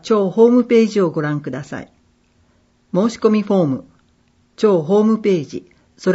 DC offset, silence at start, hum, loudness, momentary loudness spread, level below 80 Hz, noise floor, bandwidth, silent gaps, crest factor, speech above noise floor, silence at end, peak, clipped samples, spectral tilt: under 0.1%; 0.05 s; none; -16 LUFS; 15 LU; -60 dBFS; -58 dBFS; 8 kHz; none; 16 dB; 42 dB; 0 s; -2 dBFS; under 0.1%; -7 dB/octave